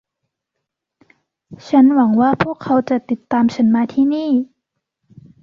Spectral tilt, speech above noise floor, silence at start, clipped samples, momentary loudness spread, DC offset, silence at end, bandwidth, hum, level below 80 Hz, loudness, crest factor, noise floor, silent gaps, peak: -7.5 dB/octave; 64 dB; 1.5 s; under 0.1%; 8 LU; under 0.1%; 1 s; 7 kHz; none; -58 dBFS; -16 LUFS; 14 dB; -79 dBFS; none; -2 dBFS